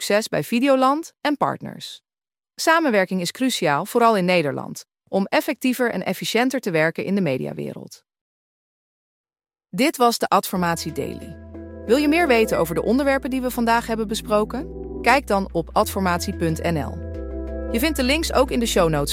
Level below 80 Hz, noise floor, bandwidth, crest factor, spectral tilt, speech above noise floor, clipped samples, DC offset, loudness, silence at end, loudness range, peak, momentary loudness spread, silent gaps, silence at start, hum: -40 dBFS; under -90 dBFS; 16.5 kHz; 20 dB; -4.5 dB/octave; over 69 dB; under 0.1%; under 0.1%; -21 LUFS; 0 s; 4 LU; -2 dBFS; 14 LU; 8.21-9.24 s; 0 s; none